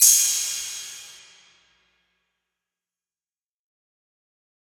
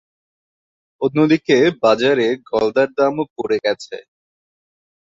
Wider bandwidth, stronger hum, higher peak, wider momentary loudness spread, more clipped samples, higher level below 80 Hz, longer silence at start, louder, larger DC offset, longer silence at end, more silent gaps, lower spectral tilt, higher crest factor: first, over 20 kHz vs 7.8 kHz; neither; about the same, -4 dBFS vs -2 dBFS; first, 24 LU vs 10 LU; neither; second, -72 dBFS vs -60 dBFS; second, 0 s vs 1 s; second, -20 LUFS vs -17 LUFS; neither; first, 3.6 s vs 1.15 s; second, none vs 3.30-3.36 s; second, 5 dB/octave vs -6 dB/octave; first, 24 dB vs 16 dB